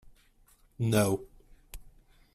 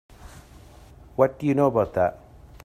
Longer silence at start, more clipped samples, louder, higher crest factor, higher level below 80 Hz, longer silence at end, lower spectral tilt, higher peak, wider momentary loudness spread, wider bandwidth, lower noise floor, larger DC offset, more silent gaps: first, 0.8 s vs 0.25 s; neither; second, -29 LUFS vs -23 LUFS; about the same, 22 dB vs 20 dB; about the same, -54 dBFS vs -50 dBFS; about the same, 0.55 s vs 0.5 s; second, -5.5 dB/octave vs -8.5 dB/octave; second, -12 dBFS vs -6 dBFS; first, 25 LU vs 5 LU; about the same, 15.5 kHz vs 14.5 kHz; first, -63 dBFS vs -48 dBFS; neither; neither